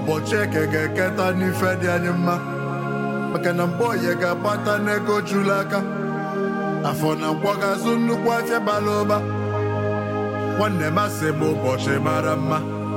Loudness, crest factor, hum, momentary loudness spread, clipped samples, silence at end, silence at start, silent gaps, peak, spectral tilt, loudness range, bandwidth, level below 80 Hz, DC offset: -22 LUFS; 16 dB; none; 4 LU; under 0.1%; 0 s; 0 s; none; -6 dBFS; -6 dB/octave; 1 LU; 16.5 kHz; -60 dBFS; under 0.1%